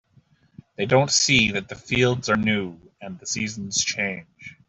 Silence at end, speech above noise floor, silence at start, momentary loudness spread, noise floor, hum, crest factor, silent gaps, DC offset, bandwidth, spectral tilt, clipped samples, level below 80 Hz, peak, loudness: 0.15 s; 36 dB; 0.8 s; 18 LU; -59 dBFS; none; 20 dB; none; under 0.1%; 8.2 kHz; -3 dB/octave; under 0.1%; -54 dBFS; -4 dBFS; -21 LUFS